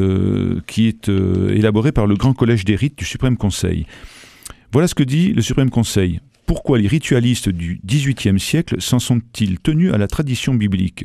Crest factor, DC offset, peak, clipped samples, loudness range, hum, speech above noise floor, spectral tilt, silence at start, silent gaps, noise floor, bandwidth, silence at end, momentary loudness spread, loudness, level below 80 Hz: 16 dB; under 0.1%; 0 dBFS; under 0.1%; 2 LU; none; 23 dB; -6 dB/octave; 0 s; none; -39 dBFS; 14.5 kHz; 0 s; 6 LU; -17 LUFS; -34 dBFS